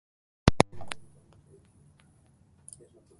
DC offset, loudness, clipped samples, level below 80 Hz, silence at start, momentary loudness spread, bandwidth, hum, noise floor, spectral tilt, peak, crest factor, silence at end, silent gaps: under 0.1%; -28 LUFS; under 0.1%; -44 dBFS; 0.45 s; 25 LU; 11.5 kHz; none; -62 dBFS; -5.5 dB/octave; 0 dBFS; 32 dB; 2.15 s; none